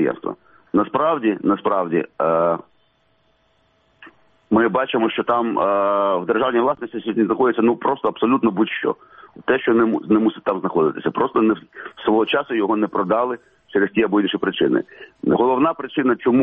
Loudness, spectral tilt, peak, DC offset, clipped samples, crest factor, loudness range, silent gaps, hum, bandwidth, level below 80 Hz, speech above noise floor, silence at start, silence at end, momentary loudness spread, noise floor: -19 LUFS; -9.5 dB/octave; -4 dBFS; under 0.1%; under 0.1%; 16 dB; 3 LU; none; none; 3.9 kHz; -60 dBFS; 43 dB; 0 s; 0 s; 8 LU; -62 dBFS